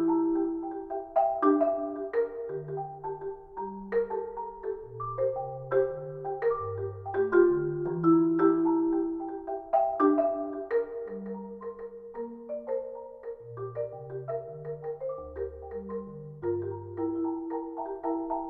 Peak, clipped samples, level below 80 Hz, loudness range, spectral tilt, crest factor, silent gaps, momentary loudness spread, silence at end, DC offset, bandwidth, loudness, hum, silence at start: -10 dBFS; under 0.1%; -58 dBFS; 11 LU; -11.5 dB/octave; 20 dB; none; 15 LU; 0 s; under 0.1%; 3.5 kHz; -30 LUFS; none; 0 s